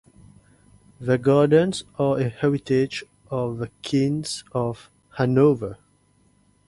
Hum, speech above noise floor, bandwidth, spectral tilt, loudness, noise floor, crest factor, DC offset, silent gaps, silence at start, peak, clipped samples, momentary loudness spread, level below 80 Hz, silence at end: 50 Hz at -50 dBFS; 40 dB; 11.5 kHz; -6.5 dB/octave; -22 LUFS; -61 dBFS; 18 dB; under 0.1%; none; 1 s; -6 dBFS; under 0.1%; 14 LU; -56 dBFS; 0.95 s